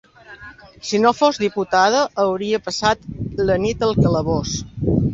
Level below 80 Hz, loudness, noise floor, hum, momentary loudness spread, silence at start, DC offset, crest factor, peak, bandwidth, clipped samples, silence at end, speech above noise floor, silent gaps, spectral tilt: -38 dBFS; -19 LUFS; -41 dBFS; none; 12 LU; 0.3 s; under 0.1%; 18 dB; -2 dBFS; 8 kHz; under 0.1%; 0 s; 23 dB; none; -5.5 dB/octave